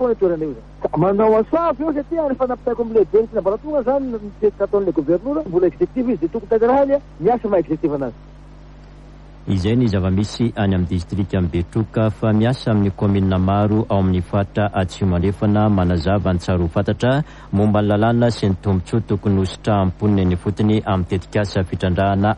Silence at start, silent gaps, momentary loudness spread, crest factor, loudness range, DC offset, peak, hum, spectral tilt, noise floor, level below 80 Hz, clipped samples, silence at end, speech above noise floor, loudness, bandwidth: 0 s; none; 6 LU; 14 dB; 3 LU; under 0.1%; -4 dBFS; none; -8 dB/octave; -40 dBFS; -38 dBFS; under 0.1%; 0 s; 22 dB; -19 LUFS; 9.6 kHz